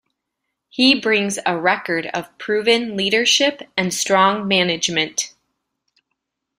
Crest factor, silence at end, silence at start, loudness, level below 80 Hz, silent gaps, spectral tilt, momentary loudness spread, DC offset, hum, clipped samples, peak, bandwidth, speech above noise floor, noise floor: 18 dB; 1.3 s; 0.75 s; -17 LUFS; -62 dBFS; none; -2.5 dB/octave; 9 LU; under 0.1%; none; under 0.1%; -2 dBFS; 15.5 kHz; 60 dB; -78 dBFS